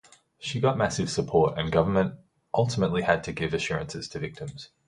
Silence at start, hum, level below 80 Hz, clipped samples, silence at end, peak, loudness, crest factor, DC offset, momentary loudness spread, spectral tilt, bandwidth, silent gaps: 0.4 s; none; -50 dBFS; under 0.1%; 0.2 s; -6 dBFS; -27 LUFS; 20 dB; under 0.1%; 11 LU; -5.5 dB/octave; 11.5 kHz; none